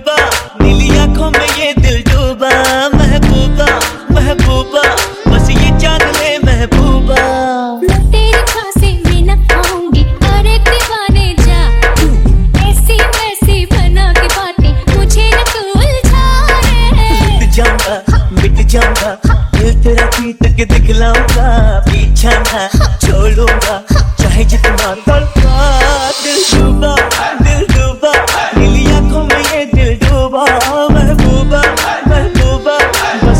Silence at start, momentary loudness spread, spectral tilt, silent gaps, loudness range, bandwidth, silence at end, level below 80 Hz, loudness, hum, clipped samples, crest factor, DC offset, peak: 0 s; 3 LU; -5 dB/octave; none; 1 LU; 16.5 kHz; 0 s; -10 dBFS; -10 LUFS; none; under 0.1%; 8 dB; under 0.1%; 0 dBFS